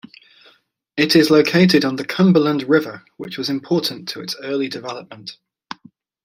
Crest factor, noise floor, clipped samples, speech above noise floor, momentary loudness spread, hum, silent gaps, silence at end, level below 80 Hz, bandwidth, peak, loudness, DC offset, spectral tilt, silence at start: 18 dB; -56 dBFS; under 0.1%; 39 dB; 22 LU; none; none; 0.95 s; -62 dBFS; 16 kHz; -2 dBFS; -17 LUFS; under 0.1%; -5.5 dB/octave; 0.95 s